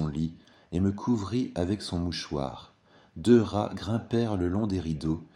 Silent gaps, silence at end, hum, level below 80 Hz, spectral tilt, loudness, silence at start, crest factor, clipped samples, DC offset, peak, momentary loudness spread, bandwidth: none; 0.1 s; none; -50 dBFS; -7 dB/octave; -29 LUFS; 0 s; 20 dB; under 0.1%; under 0.1%; -8 dBFS; 12 LU; 11 kHz